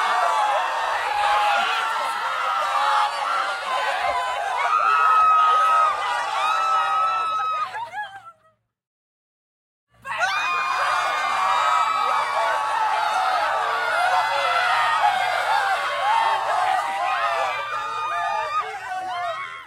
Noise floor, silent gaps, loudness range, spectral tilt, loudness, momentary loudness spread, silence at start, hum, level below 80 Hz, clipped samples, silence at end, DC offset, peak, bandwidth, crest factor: -63 dBFS; 8.87-9.87 s; 7 LU; 0 dB/octave; -21 LUFS; 8 LU; 0 s; none; -64 dBFS; under 0.1%; 0 s; under 0.1%; -8 dBFS; 16.5 kHz; 14 dB